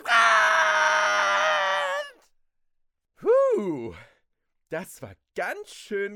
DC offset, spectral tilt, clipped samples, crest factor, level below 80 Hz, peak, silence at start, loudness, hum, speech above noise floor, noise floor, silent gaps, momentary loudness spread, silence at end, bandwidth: under 0.1%; -2 dB/octave; under 0.1%; 20 dB; -70 dBFS; -6 dBFS; 0.05 s; -22 LUFS; none; 41 dB; -74 dBFS; none; 20 LU; 0 s; 16.5 kHz